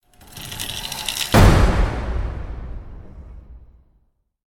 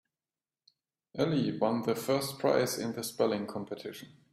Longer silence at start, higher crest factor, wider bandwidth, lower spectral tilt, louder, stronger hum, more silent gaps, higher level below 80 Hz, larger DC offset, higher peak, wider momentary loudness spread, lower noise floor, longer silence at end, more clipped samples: second, 0.35 s vs 1.15 s; about the same, 20 dB vs 20 dB; first, 18 kHz vs 16 kHz; about the same, -5 dB/octave vs -5 dB/octave; first, -19 LUFS vs -32 LUFS; neither; neither; first, -24 dBFS vs -72 dBFS; neither; first, 0 dBFS vs -14 dBFS; first, 27 LU vs 13 LU; second, -63 dBFS vs under -90 dBFS; first, 0.95 s vs 0.25 s; neither